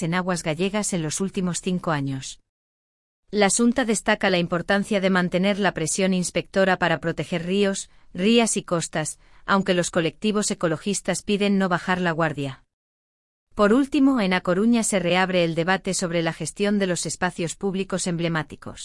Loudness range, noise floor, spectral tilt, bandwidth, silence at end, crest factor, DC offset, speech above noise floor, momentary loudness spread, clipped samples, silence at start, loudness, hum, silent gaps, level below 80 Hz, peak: 3 LU; under -90 dBFS; -4.5 dB/octave; 12 kHz; 0 s; 18 dB; under 0.1%; over 68 dB; 8 LU; under 0.1%; 0 s; -23 LUFS; none; 2.49-3.23 s, 12.73-13.47 s; -52 dBFS; -4 dBFS